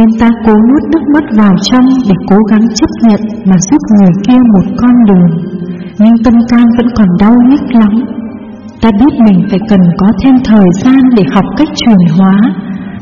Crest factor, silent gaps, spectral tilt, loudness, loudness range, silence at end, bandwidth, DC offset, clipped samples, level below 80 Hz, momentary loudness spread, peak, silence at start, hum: 6 dB; none; -7 dB/octave; -6 LUFS; 1 LU; 0 s; 7.4 kHz; 1%; 2%; -32 dBFS; 6 LU; 0 dBFS; 0 s; none